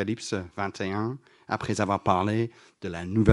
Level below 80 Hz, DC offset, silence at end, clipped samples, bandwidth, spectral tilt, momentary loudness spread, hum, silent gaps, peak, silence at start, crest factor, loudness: -58 dBFS; under 0.1%; 0 s; under 0.1%; 11.5 kHz; -6.5 dB/octave; 11 LU; none; none; -4 dBFS; 0 s; 24 dB; -29 LUFS